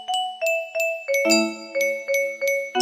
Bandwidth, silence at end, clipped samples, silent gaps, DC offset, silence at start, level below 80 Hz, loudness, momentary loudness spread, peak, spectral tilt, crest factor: 15 kHz; 0 s; under 0.1%; none; under 0.1%; 0 s; -76 dBFS; -22 LUFS; 6 LU; -4 dBFS; -1.5 dB/octave; 18 dB